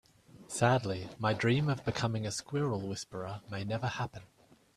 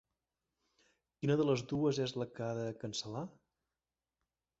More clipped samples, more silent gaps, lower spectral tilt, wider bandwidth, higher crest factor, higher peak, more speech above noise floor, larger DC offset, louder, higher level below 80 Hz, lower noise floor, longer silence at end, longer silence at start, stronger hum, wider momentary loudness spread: neither; neither; about the same, -5.5 dB/octave vs -6 dB/octave; first, 13.5 kHz vs 8 kHz; about the same, 24 dB vs 20 dB; first, -10 dBFS vs -20 dBFS; second, 21 dB vs over 54 dB; neither; first, -34 LUFS vs -37 LUFS; first, -64 dBFS vs -72 dBFS; second, -54 dBFS vs under -90 dBFS; second, 0.5 s vs 1.3 s; second, 0.35 s vs 1.2 s; neither; about the same, 12 LU vs 11 LU